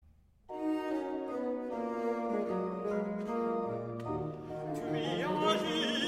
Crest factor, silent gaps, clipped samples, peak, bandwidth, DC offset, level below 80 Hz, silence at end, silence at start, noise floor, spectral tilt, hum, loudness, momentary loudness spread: 18 dB; none; under 0.1%; -18 dBFS; 15.5 kHz; under 0.1%; -64 dBFS; 0 s; 0.5 s; -55 dBFS; -5.5 dB/octave; none; -35 LUFS; 8 LU